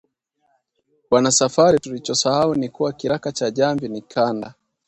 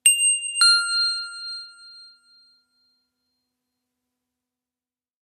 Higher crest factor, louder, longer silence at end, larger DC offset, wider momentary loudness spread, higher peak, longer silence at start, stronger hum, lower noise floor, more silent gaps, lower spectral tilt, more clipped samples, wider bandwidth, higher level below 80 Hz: about the same, 18 dB vs 22 dB; about the same, -19 LUFS vs -18 LUFS; second, 0.35 s vs 3.35 s; neither; second, 10 LU vs 19 LU; about the same, -2 dBFS vs -4 dBFS; first, 1.1 s vs 0.05 s; neither; second, -68 dBFS vs under -90 dBFS; neither; first, -4 dB/octave vs 7.5 dB/octave; neither; second, 9 kHz vs 15.5 kHz; first, -58 dBFS vs -84 dBFS